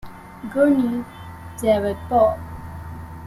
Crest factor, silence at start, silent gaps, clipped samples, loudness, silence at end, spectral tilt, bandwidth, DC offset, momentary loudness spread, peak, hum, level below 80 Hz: 16 dB; 0.05 s; none; under 0.1%; -20 LUFS; 0 s; -7 dB/octave; 14.5 kHz; under 0.1%; 19 LU; -6 dBFS; none; -44 dBFS